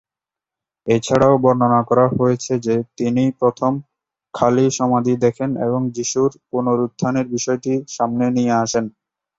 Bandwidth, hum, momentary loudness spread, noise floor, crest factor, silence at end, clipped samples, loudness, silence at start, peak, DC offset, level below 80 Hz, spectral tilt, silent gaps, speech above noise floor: 8 kHz; none; 7 LU; -88 dBFS; 16 dB; 0.5 s; under 0.1%; -18 LUFS; 0.85 s; -2 dBFS; under 0.1%; -54 dBFS; -6 dB/octave; none; 71 dB